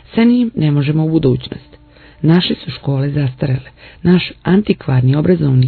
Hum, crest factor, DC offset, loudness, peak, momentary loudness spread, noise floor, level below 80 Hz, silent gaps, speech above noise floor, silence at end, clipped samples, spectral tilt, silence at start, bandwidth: none; 14 dB; under 0.1%; -15 LUFS; 0 dBFS; 7 LU; -42 dBFS; -42 dBFS; none; 29 dB; 0 s; under 0.1%; -11 dB/octave; 0.15 s; 4.6 kHz